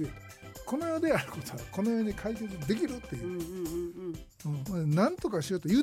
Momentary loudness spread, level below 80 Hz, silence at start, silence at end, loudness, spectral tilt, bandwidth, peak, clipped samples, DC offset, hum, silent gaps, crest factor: 12 LU; -54 dBFS; 0 s; 0 s; -33 LUFS; -6.5 dB/octave; 16.5 kHz; -14 dBFS; under 0.1%; under 0.1%; none; none; 18 dB